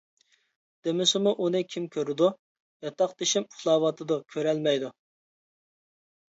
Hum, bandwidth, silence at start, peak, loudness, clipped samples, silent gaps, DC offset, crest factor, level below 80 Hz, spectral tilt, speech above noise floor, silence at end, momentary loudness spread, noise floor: none; 8 kHz; 0.85 s; -10 dBFS; -27 LUFS; under 0.1%; 2.39-2.80 s; under 0.1%; 18 dB; -80 dBFS; -4 dB/octave; over 63 dB; 1.4 s; 9 LU; under -90 dBFS